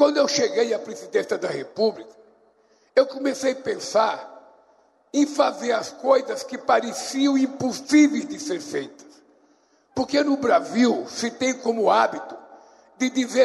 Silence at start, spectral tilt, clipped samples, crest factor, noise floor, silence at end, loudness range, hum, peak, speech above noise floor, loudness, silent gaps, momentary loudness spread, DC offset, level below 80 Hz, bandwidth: 0 s; -3.5 dB/octave; under 0.1%; 16 dB; -61 dBFS; 0 s; 3 LU; none; -6 dBFS; 39 dB; -23 LUFS; none; 10 LU; under 0.1%; -68 dBFS; 12.5 kHz